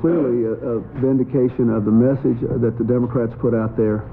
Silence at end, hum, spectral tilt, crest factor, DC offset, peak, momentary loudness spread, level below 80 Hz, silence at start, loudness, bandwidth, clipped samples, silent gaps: 0 s; none; -13 dB/octave; 12 dB; under 0.1%; -6 dBFS; 5 LU; -44 dBFS; 0 s; -19 LUFS; 3.5 kHz; under 0.1%; none